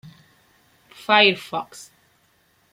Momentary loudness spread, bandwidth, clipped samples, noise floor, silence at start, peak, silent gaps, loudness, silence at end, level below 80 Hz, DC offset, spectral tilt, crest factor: 23 LU; 16.5 kHz; under 0.1%; -62 dBFS; 1.1 s; -2 dBFS; none; -18 LUFS; 0.9 s; -72 dBFS; under 0.1%; -3.5 dB/octave; 22 dB